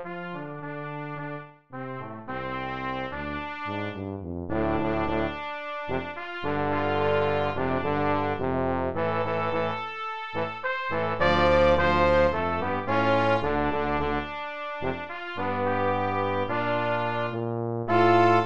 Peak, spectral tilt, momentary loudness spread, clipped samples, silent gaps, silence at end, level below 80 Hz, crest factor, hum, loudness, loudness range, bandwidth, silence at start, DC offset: -8 dBFS; -7.5 dB/octave; 14 LU; under 0.1%; none; 0 s; -44 dBFS; 18 dB; none; -27 LUFS; 10 LU; 8 kHz; 0 s; 0.8%